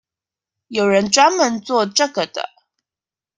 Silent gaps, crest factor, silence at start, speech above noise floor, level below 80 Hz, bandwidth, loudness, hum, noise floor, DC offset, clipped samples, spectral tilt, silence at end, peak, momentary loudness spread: none; 18 dB; 0.7 s; over 73 dB; -62 dBFS; 10.5 kHz; -17 LUFS; none; under -90 dBFS; under 0.1%; under 0.1%; -2.5 dB/octave; 0.95 s; 0 dBFS; 13 LU